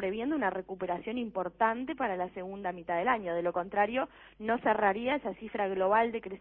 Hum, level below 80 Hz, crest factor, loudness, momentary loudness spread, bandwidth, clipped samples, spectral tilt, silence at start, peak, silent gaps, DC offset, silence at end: none; -64 dBFS; 18 dB; -32 LUFS; 10 LU; 4.3 kHz; under 0.1%; -3.5 dB/octave; 0 s; -14 dBFS; none; under 0.1%; 0 s